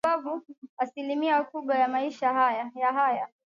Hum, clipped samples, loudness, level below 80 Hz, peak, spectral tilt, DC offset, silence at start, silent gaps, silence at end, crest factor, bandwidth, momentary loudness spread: none; under 0.1%; -27 LUFS; -78 dBFS; -14 dBFS; -4.5 dB/octave; under 0.1%; 0.05 s; 0.58-0.62 s, 0.69-0.77 s; 0.25 s; 14 dB; 8.2 kHz; 9 LU